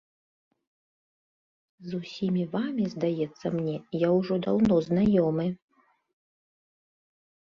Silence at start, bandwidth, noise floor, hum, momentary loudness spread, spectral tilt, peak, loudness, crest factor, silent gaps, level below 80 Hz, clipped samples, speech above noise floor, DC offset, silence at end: 1.8 s; 7.2 kHz; under -90 dBFS; none; 13 LU; -8.5 dB/octave; -12 dBFS; -27 LUFS; 18 dB; none; -60 dBFS; under 0.1%; over 64 dB; under 0.1%; 2 s